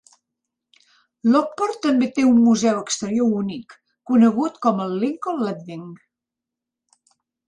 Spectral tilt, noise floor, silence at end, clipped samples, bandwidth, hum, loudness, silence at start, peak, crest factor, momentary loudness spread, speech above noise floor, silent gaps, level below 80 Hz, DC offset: -5.5 dB/octave; -86 dBFS; 1.5 s; under 0.1%; 9.6 kHz; none; -20 LUFS; 1.25 s; -6 dBFS; 16 dB; 15 LU; 67 dB; none; -66 dBFS; under 0.1%